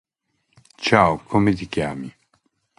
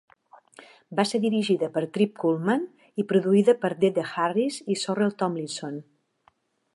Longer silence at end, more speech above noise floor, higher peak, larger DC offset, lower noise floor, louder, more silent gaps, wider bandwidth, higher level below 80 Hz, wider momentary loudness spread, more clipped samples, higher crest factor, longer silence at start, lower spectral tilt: second, 0.7 s vs 0.9 s; first, 51 dB vs 41 dB; first, 0 dBFS vs -6 dBFS; neither; first, -71 dBFS vs -65 dBFS; first, -20 LUFS vs -25 LUFS; neither; about the same, 11.5 kHz vs 11.5 kHz; first, -48 dBFS vs -76 dBFS; first, 15 LU vs 12 LU; neither; about the same, 22 dB vs 18 dB; about the same, 0.8 s vs 0.9 s; about the same, -6 dB/octave vs -5.5 dB/octave